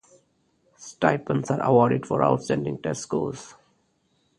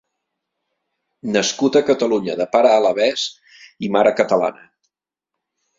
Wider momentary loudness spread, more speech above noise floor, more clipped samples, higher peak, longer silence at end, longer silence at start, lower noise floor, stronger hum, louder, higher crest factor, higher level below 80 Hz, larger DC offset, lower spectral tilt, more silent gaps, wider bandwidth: first, 14 LU vs 10 LU; second, 45 dB vs 67 dB; neither; second, -4 dBFS vs 0 dBFS; second, 0.85 s vs 1.25 s; second, 0.8 s vs 1.25 s; second, -68 dBFS vs -83 dBFS; neither; second, -24 LUFS vs -17 LUFS; about the same, 22 dB vs 18 dB; about the same, -60 dBFS vs -64 dBFS; neither; first, -6.5 dB/octave vs -4 dB/octave; neither; first, 11.5 kHz vs 7.8 kHz